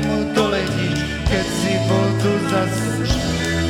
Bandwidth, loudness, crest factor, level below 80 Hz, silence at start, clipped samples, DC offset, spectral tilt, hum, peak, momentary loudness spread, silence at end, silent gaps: 16.5 kHz; -19 LUFS; 16 dB; -32 dBFS; 0 s; under 0.1%; under 0.1%; -5.5 dB/octave; none; -4 dBFS; 3 LU; 0 s; none